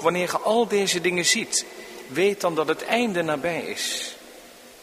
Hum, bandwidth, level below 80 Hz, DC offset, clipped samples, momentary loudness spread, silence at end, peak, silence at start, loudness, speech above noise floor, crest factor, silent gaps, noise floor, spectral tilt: none; 15.5 kHz; -66 dBFS; under 0.1%; under 0.1%; 11 LU; 0 s; -6 dBFS; 0 s; -23 LUFS; 22 dB; 20 dB; none; -46 dBFS; -2.5 dB/octave